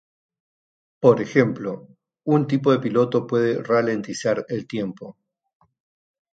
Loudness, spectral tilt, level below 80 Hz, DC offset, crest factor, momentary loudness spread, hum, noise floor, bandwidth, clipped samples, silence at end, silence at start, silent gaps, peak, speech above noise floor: -21 LUFS; -7 dB/octave; -68 dBFS; under 0.1%; 22 dB; 13 LU; none; under -90 dBFS; 9 kHz; under 0.1%; 1.25 s; 1 s; none; -2 dBFS; over 69 dB